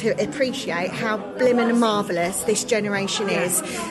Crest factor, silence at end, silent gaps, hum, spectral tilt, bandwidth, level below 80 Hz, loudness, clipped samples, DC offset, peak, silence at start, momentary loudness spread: 14 dB; 0 s; none; none; -3.5 dB/octave; 13 kHz; -58 dBFS; -22 LUFS; under 0.1%; under 0.1%; -8 dBFS; 0 s; 6 LU